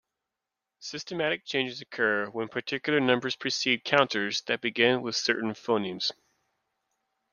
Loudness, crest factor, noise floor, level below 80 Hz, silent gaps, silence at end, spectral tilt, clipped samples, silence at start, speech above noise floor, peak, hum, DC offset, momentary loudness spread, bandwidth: -27 LUFS; 24 dB; -87 dBFS; -72 dBFS; none; 1.2 s; -3.5 dB/octave; under 0.1%; 0.8 s; 59 dB; -6 dBFS; none; under 0.1%; 9 LU; 10 kHz